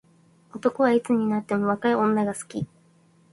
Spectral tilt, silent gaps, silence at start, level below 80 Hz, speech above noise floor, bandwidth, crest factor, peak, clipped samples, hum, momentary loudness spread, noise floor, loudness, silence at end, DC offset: -6.5 dB/octave; none; 0.55 s; -64 dBFS; 36 dB; 11.5 kHz; 18 dB; -8 dBFS; under 0.1%; none; 13 LU; -59 dBFS; -24 LUFS; 0.65 s; under 0.1%